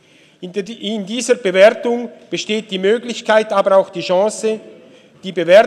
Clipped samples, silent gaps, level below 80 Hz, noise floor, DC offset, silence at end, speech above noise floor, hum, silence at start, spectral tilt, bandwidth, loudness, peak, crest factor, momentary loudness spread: under 0.1%; none; -70 dBFS; -44 dBFS; under 0.1%; 0 s; 29 dB; none; 0.4 s; -4 dB/octave; 12 kHz; -16 LUFS; 0 dBFS; 16 dB; 15 LU